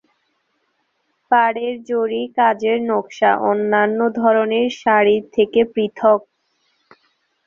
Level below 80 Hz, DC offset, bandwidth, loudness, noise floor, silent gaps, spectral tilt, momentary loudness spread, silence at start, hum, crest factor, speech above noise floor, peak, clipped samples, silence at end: -64 dBFS; under 0.1%; 7.2 kHz; -17 LUFS; -68 dBFS; none; -5.5 dB/octave; 5 LU; 1.3 s; none; 16 dB; 51 dB; -2 dBFS; under 0.1%; 1.25 s